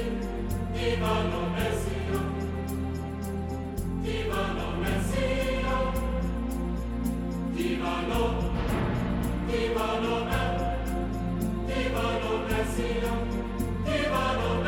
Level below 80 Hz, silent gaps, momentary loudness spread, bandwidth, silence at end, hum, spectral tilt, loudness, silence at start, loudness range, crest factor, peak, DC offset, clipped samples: -34 dBFS; none; 5 LU; 17 kHz; 0 s; none; -6 dB/octave; -29 LUFS; 0 s; 2 LU; 14 dB; -14 dBFS; under 0.1%; under 0.1%